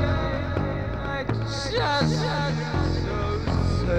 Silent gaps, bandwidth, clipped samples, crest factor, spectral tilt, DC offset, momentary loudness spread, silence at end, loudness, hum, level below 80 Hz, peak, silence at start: none; 9.2 kHz; under 0.1%; 14 dB; -6 dB/octave; 0.4%; 5 LU; 0 s; -26 LUFS; none; -34 dBFS; -10 dBFS; 0 s